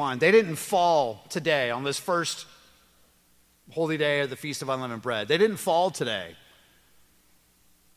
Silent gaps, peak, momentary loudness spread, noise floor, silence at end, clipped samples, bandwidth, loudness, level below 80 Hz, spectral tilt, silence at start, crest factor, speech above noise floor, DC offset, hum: none; -8 dBFS; 11 LU; -63 dBFS; 1.6 s; under 0.1%; 16 kHz; -25 LUFS; -70 dBFS; -4 dB/octave; 0 s; 20 dB; 37 dB; under 0.1%; none